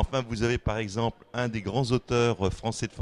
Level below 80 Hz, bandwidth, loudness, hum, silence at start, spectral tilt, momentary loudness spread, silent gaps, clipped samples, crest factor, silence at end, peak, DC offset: -40 dBFS; 11 kHz; -28 LUFS; none; 0 s; -5.5 dB/octave; 6 LU; none; under 0.1%; 18 dB; 0 s; -10 dBFS; under 0.1%